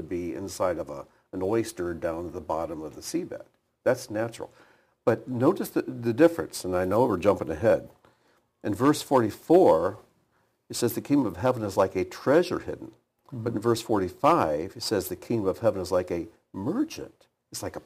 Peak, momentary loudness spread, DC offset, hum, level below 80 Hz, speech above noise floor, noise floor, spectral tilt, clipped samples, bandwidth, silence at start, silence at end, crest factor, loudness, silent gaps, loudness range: -6 dBFS; 15 LU; under 0.1%; none; -58 dBFS; 44 dB; -69 dBFS; -6 dB/octave; under 0.1%; 15.5 kHz; 0 s; 0.05 s; 20 dB; -27 LUFS; none; 7 LU